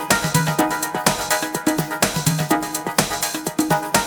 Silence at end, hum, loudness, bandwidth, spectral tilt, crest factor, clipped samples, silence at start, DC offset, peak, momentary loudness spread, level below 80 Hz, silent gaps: 0 s; none; -20 LUFS; over 20 kHz; -3.5 dB/octave; 20 dB; under 0.1%; 0 s; under 0.1%; 0 dBFS; 3 LU; -46 dBFS; none